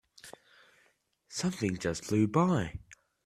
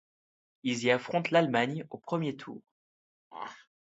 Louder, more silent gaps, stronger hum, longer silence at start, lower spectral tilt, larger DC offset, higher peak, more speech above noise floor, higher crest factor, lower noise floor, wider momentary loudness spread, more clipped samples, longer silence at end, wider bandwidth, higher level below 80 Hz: about the same, -31 LUFS vs -30 LUFS; second, none vs 2.71-3.31 s; neither; second, 0.25 s vs 0.65 s; about the same, -6 dB/octave vs -5.5 dB/octave; neither; second, -14 dBFS vs -10 dBFS; second, 41 dB vs over 60 dB; about the same, 20 dB vs 22 dB; second, -71 dBFS vs under -90 dBFS; first, 24 LU vs 19 LU; neither; about the same, 0.3 s vs 0.25 s; first, 13.5 kHz vs 8.2 kHz; first, -60 dBFS vs -78 dBFS